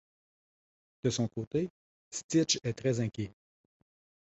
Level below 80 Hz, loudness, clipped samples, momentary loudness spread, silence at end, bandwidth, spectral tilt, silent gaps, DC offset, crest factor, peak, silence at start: -64 dBFS; -33 LUFS; under 0.1%; 13 LU; 0.95 s; 8.2 kHz; -4.5 dB/octave; 1.47-1.51 s, 1.70-2.11 s, 2.24-2.29 s; under 0.1%; 22 dB; -14 dBFS; 1.05 s